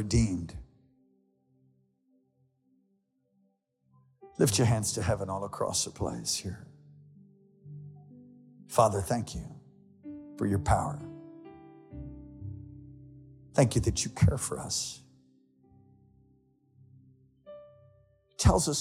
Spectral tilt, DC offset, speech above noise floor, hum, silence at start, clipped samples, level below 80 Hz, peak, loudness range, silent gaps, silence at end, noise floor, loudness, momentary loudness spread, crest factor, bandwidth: -5 dB/octave; under 0.1%; 46 dB; none; 0 s; under 0.1%; -46 dBFS; -10 dBFS; 6 LU; none; 0 s; -74 dBFS; -29 LUFS; 24 LU; 24 dB; 16 kHz